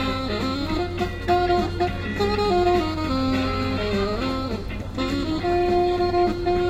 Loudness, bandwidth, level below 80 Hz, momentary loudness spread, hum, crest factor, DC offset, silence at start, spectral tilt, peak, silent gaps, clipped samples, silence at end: -23 LUFS; 15 kHz; -36 dBFS; 6 LU; none; 14 dB; under 0.1%; 0 s; -6.5 dB/octave; -8 dBFS; none; under 0.1%; 0 s